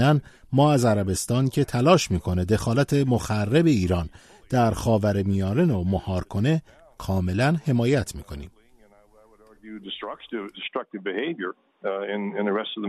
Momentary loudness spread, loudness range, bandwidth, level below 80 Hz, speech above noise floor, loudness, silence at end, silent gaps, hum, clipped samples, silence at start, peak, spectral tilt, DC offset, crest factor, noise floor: 14 LU; 11 LU; 13.5 kHz; -46 dBFS; 32 dB; -24 LUFS; 0 s; none; none; under 0.1%; 0 s; -4 dBFS; -6.5 dB/octave; under 0.1%; 20 dB; -55 dBFS